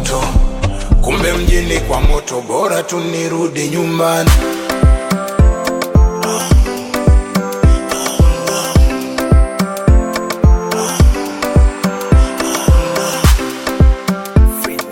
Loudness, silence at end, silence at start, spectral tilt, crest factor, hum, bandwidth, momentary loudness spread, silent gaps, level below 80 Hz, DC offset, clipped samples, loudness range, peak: -14 LUFS; 0 s; 0 s; -5.5 dB/octave; 12 dB; none; 17 kHz; 5 LU; none; -14 dBFS; under 0.1%; under 0.1%; 2 LU; 0 dBFS